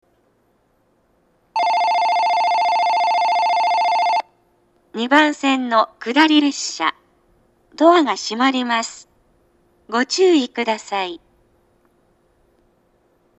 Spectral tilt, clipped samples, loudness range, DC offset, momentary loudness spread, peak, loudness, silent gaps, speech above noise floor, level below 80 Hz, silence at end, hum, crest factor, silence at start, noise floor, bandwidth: -2 dB/octave; under 0.1%; 5 LU; under 0.1%; 10 LU; 0 dBFS; -17 LUFS; none; 45 dB; -68 dBFS; 2.25 s; none; 20 dB; 1.55 s; -62 dBFS; 10.5 kHz